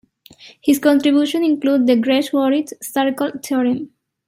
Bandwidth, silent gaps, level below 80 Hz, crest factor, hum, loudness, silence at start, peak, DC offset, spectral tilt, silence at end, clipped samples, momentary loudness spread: 16 kHz; none; -68 dBFS; 14 dB; none; -17 LUFS; 0.45 s; -2 dBFS; under 0.1%; -4 dB/octave; 0.4 s; under 0.1%; 9 LU